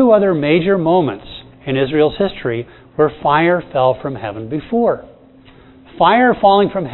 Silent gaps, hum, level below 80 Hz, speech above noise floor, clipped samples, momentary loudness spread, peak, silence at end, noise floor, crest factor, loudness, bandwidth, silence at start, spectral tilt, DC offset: none; none; -46 dBFS; 29 dB; under 0.1%; 13 LU; 0 dBFS; 0 s; -44 dBFS; 16 dB; -15 LUFS; 4.2 kHz; 0 s; -10 dB/octave; under 0.1%